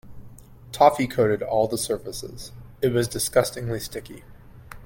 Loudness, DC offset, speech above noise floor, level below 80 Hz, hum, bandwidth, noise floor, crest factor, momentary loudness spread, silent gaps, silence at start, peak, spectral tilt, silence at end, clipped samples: -23 LUFS; under 0.1%; 21 dB; -48 dBFS; none; 17 kHz; -44 dBFS; 22 dB; 20 LU; none; 0.05 s; -2 dBFS; -4.5 dB/octave; 0 s; under 0.1%